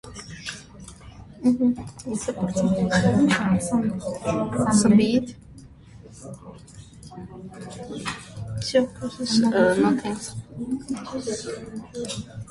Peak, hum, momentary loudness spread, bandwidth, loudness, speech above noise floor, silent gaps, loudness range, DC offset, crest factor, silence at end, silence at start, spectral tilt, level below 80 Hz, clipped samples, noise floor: -6 dBFS; none; 22 LU; 11.5 kHz; -23 LUFS; 23 dB; none; 9 LU; under 0.1%; 18 dB; 0 s; 0.05 s; -5.5 dB/octave; -50 dBFS; under 0.1%; -46 dBFS